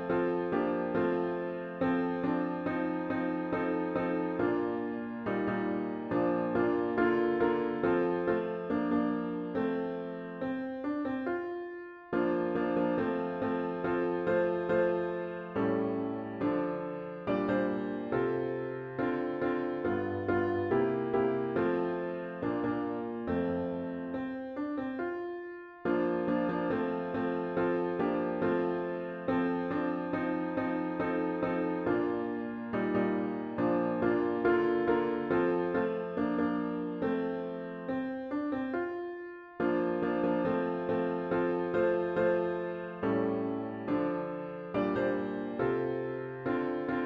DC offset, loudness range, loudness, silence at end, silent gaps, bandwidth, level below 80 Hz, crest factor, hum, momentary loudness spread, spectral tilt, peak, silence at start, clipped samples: under 0.1%; 4 LU; -32 LUFS; 0 s; none; 5.4 kHz; -64 dBFS; 16 dB; none; 7 LU; -9.5 dB/octave; -16 dBFS; 0 s; under 0.1%